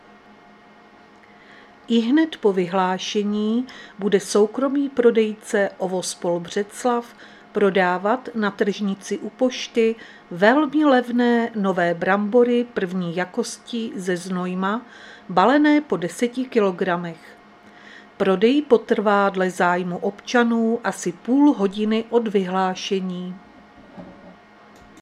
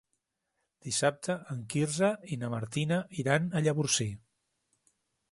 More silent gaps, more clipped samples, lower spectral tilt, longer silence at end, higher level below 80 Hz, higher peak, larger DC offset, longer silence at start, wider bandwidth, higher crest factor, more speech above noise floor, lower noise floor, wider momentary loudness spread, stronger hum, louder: neither; neither; about the same, -5.5 dB/octave vs -4.5 dB/octave; second, 0.7 s vs 1.15 s; about the same, -66 dBFS vs -66 dBFS; first, 0 dBFS vs -10 dBFS; neither; first, 1.9 s vs 0.85 s; first, 13 kHz vs 11.5 kHz; about the same, 20 dB vs 22 dB; second, 28 dB vs 51 dB; second, -49 dBFS vs -82 dBFS; first, 11 LU vs 8 LU; neither; first, -21 LUFS vs -31 LUFS